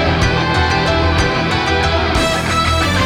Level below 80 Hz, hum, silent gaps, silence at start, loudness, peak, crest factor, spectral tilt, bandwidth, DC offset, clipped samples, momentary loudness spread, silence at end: -24 dBFS; none; none; 0 s; -14 LUFS; -4 dBFS; 12 dB; -4.5 dB/octave; 15 kHz; under 0.1%; under 0.1%; 1 LU; 0 s